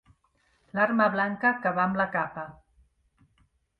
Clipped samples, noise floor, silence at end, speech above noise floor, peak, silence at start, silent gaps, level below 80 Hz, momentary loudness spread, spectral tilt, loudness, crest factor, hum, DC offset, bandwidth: under 0.1%; -69 dBFS; 1.25 s; 43 dB; -8 dBFS; 0.75 s; none; -64 dBFS; 13 LU; -8.5 dB/octave; -26 LUFS; 20 dB; none; under 0.1%; 5.2 kHz